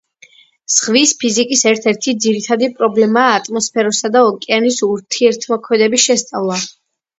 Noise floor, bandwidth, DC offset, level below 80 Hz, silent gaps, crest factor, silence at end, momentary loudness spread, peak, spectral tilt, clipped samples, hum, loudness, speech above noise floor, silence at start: -47 dBFS; 8.2 kHz; under 0.1%; -64 dBFS; none; 14 dB; 0.5 s; 6 LU; 0 dBFS; -2.5 dB/octave; under 0.1%; none; -14 LUFS; 33 dB; 0.7 s